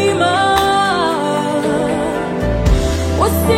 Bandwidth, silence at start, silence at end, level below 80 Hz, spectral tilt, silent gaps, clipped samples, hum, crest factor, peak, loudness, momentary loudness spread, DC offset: 16.5 kHz; 0 s; 0 s; -24 dBFS; -5 dB/octave; none; under 0.1%; none; 14 dB; -2 dBFS; -15 LUFS; 5 LU; under 0.1%